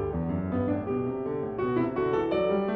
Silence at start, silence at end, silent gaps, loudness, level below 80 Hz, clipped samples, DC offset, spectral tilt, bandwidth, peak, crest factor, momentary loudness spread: 0 s; 0 s; none; -29 LUFS; -48 dBFS; under 0.1%; under 0.1%; -10 dB/octave; 4.9 kHz; -16 dBFS; 12 dB; 5 LU